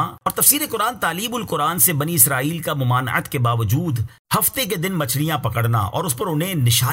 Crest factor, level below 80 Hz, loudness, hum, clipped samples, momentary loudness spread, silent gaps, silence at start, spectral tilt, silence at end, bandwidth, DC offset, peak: 18 dB; -50 dBFS; -19 LUFS; none; under 0.1%; 8 LU; 4.19-4.25 s; 0 s; -3.5 dB/octave; 0 s; 16.5 kHz; under 0.1%; 0 dBFS